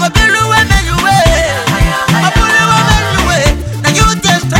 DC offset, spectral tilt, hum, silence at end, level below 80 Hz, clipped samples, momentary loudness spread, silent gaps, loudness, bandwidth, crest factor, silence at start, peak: under 0.1%; -4 dB/octave; none; 0 s; -18 dBFS; 0.3%; 4 LU; none; -9 LUFS; 17.5 kHz; 10 dB; 0 s; 0 dBFS